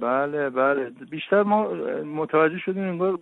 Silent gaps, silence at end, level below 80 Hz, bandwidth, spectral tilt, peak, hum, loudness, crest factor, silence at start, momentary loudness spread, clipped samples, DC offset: none; 0 s; -70 dBFS; 4.1 kHz; -9 dB/octave; -8 dBFS; none; -24 LUFS; 16 dB; 0 s; 8 LU; under 0.1%; under 0.1%